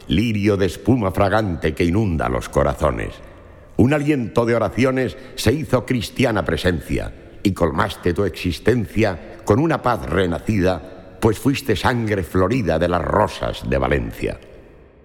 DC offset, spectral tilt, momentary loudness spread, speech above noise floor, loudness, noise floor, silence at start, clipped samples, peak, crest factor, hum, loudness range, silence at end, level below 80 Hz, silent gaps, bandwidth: under 0.1%; -6.5 dB/octave; 8 LU; 25 dB; -20 LUFS; -44 dBFS; 0 s; under 0.1%; 0 dBFS; 18 dB; none; 1 LU; 0.45 s; -34 dBFS; none; 18 kHz